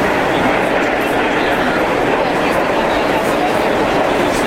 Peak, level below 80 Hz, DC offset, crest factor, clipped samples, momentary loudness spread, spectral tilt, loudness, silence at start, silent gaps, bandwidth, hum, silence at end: -2 dBFS; -36 dBFS; under 0.1%; 12 dB; under 0.1%; 1 LU; -4.5 dB/octave; -15 LUFS; 0 s; none; 16.5 kHz; none; 0 s